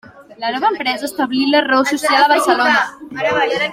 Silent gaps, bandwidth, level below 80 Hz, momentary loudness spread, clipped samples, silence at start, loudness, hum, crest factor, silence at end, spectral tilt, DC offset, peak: none; 16.5 kHz; -58 dBFS; 9 LU; under 0.1%; 0.15 s; -15 LUFS; none; 16 dB; 0 s; -2.5 dB/octave; under 0.1%; 0 dBFS